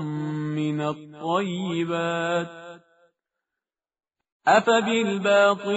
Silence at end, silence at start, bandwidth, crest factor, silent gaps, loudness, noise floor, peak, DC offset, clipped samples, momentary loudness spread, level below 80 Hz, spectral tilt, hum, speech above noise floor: 0 s; 0 s; 8 kHz; 20 dB; 4.32-4.40 s; -23 LUFS; -89 dBFS; -6 dBFS; under 0.1%; under 0.1%; 11 LU; -70 dBFS; -4 dB/octave; none; 66 dB